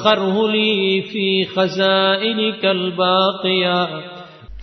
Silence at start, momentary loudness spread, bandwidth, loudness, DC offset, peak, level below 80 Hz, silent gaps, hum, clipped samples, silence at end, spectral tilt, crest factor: 0 s; 5 LU; 6.2 kHz; -17 LUFS; under 0.1%; -2 dBFS; -50 dBFS; none; none; under 0.1%; 0 s; -6 dB/octave; 16 dB